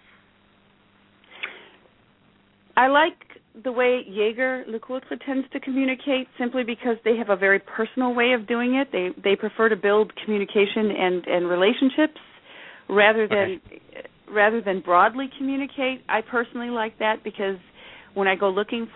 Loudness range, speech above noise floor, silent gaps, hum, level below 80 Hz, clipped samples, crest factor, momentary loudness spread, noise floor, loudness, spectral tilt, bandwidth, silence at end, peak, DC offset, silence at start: 4 LU; 36 dB; none; none; -66 dBFS; under 0.1%; 20 dB; 13 LU; -59 dBFS; -23 LUFS; -8.5 dB/octave; 4.1 kHz; 0.1 s; -4 dBFS; under 0.1%; 1.35 s